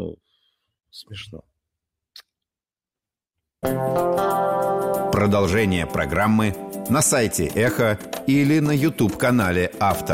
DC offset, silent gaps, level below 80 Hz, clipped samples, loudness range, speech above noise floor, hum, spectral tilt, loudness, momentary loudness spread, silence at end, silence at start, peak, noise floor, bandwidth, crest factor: under 0.1%; none; -46 dBFS; under 0.1%; 9 LU; over 70 dB; none; -5 dB/octave; -20 LUFS; 12 LU; 0 s; 0 s; -8 dBFS; under -90 dBFS; 16.5 kHz; 14 dB